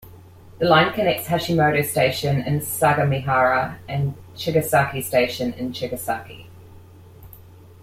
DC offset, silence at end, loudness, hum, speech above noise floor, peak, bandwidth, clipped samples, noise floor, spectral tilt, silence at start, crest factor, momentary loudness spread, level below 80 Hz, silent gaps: under 0.1%; 0.35 s; -21 LUFS; none; 24 dB; -4 dBFS; 16.5 kHz; under 0.1%; -45 dBFS; -5 dB/octave; 0.05 s; 18 dB; 10 LU; -52 dBFS; none